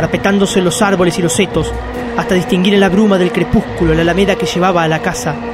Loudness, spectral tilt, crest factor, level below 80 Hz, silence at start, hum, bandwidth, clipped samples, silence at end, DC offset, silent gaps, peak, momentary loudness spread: -13 LUFS; -5 dB/octave; 12 dB; -30 dBFS; 0 s; none; 15.5 kHz; under 0.1%; 0 s; under 0.1%; none; 0 dBFS; 8 LU